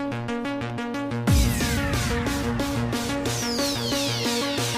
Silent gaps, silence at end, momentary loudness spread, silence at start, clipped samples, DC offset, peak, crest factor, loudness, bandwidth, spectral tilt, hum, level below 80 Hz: none; 0 s; 7 LU; 0 s; under 0.1%; under 0.1%; -10 dBFS; 16 dB; -25 LUFS; 16 kHz; -4.5 dB/octave; none; -34 dBFS